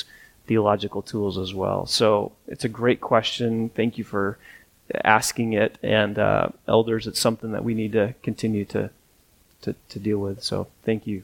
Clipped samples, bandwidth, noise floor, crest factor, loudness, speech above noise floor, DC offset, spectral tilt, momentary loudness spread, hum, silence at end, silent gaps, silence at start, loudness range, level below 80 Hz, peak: under 0.1%; 18.5 kHz; -59 dBFS; 24 dB; -24 LUFS; 36 dB; under 0.1%; -5 dB/octave; 11 LU; none; 0 s; none; 0 s; 5 LU; -54 dBFS; 0 dBFS